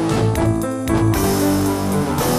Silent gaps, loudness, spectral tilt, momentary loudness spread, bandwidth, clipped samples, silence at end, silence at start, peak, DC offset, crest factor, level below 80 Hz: none; -18 LUFS; -6 dB/octave; 3 LU; 16 kHz; under 0.1%; 0 s; 0 s; -4 dBFS; under 0.1%; 14 dB; -32 dBFS